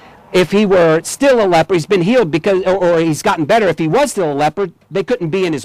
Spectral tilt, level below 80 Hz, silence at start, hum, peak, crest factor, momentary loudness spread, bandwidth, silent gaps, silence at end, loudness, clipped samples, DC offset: -5.5 dB/octave; -46 dBFS; 0.3 s; none; -6 dBFS; 8 dB; 6 LU; 15.5 kHz; none; 0 s; -14 LUFS; under 0.1%; under 0.1%